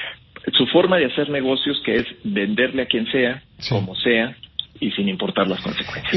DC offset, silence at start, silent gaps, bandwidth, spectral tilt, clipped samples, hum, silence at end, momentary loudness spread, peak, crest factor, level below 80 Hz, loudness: under 0.1%; 0 s; none; 6 kHz; -6.5 dB/octave; under 0.1%; none; 0 s; 10 LU; -2 dBFS; 20 dB; -52 dBFS; -20 LUFS